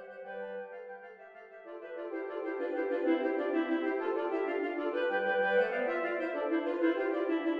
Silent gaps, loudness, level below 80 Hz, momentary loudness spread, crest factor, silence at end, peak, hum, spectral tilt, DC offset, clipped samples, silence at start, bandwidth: none; -33 LUFS; -86 dBFS; 17 LU; 16 dB; 0 s; -18 dBFS; none; -6.5 dB/octave; under 0.1%; under 0.1%; 0 s; 5 kHz